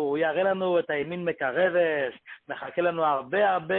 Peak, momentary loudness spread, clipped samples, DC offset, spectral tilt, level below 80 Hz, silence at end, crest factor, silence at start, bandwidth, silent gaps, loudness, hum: -10 dBFS; 9 LU; under 0.1%; under 0.1%; -9.5 dB/octave; -70 dBFS; 0 s; 14 dB; 0 s; 4.1 kHz; none; -26 LUFS; none